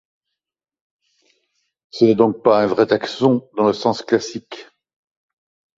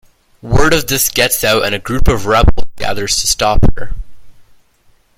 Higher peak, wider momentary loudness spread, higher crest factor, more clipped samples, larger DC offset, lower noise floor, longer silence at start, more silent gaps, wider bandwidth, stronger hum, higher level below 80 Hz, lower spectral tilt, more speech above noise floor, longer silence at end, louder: about the same, -2 dBFS vs 0 dBFS; first, 18 LU vs 10 LU; first, 18 dB vs 12 dB; second, under 0.1% vs 0.3%; neither; first, -85 dBFS vs -51 dBFS; first, 1.95 s vs 0.45 s; neither; second, 7.8 kHz vs 16.5 kHz; neither; second, -62 dBFS vs -20 dBFS; first, -6 dB/octave vs -3.5 dB/octave; first, 68 dB vs 41 dB; first, 1.15 s vs 0.85 s; second, -17 LUFS vs -13 LUFS